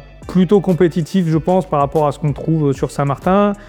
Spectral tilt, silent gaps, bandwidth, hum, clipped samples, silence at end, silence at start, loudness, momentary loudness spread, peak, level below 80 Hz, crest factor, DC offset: -8 dB/octave; none; 14 kHz; none; under 0.1%; 0 s; 0 s; -16 LUFS; 5 LU; -2 dBFS; -40 dBFS; 14 dB; under 0.1%